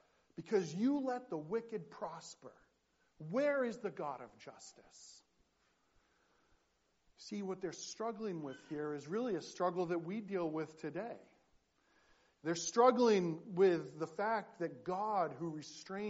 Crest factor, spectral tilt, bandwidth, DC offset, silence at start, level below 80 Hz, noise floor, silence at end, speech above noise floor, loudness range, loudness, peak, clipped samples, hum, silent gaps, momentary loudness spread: 24 dB; -5 dB/octave; 8 kHz; under 0.1%; 0.4 s; -82 dBFS; -79 dBFS; 0 s; 41 dB; 13 LU; -38 LUFS; -16 dBFS; under 0.1%; none; none; 22 LU